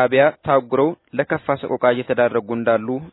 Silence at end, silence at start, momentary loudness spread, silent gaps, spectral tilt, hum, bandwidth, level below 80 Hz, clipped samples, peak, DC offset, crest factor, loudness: 0.05 s; 0 s; 6 LU; none; -10.5 dB/octave; none; 4.1 kHz; -58 dBFS; under 0.1%; -2 dBFS; under 0.1%; 18 dB; -19 LUFS